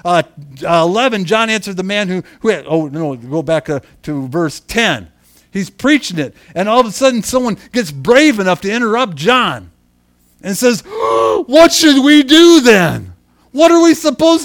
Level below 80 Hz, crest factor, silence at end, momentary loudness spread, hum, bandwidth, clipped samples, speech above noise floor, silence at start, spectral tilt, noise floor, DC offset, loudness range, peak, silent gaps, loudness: -46 dBFS; 12 dB; 0 s; 15 LU; none; 18.5 kHz; 0.5%; 42 dB; 0.05 s; -4 dB/octave; -54 dBFS; under 0.1%; 9 LU; 0 dBFS; none; -12 LUFS